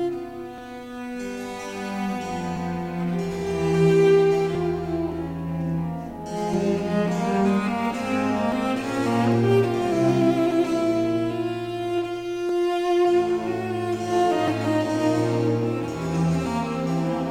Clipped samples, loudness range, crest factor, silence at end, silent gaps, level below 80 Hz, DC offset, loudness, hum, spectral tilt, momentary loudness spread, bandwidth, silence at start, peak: under 0.1%; 3 LU; 16 dB; 0 s; none; -50 dBFS; under 0.1%; -24 LUFS; none; -7 dB/octave; 11 LU; 15.5 kHz; 0 s; -8 dBFS